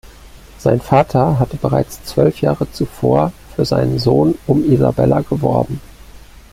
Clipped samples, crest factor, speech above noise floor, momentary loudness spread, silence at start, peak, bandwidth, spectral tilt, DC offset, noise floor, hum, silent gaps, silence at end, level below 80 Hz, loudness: under 0.1%; 14 dB; 24 dB; 7 LU; 0.05 s; 0 dBFS; 15.5 kHz; -8 dB/octave; under 0.1%; -39 dBFS; none; none; 0.15 s; -38 dBFS; -16 LUFS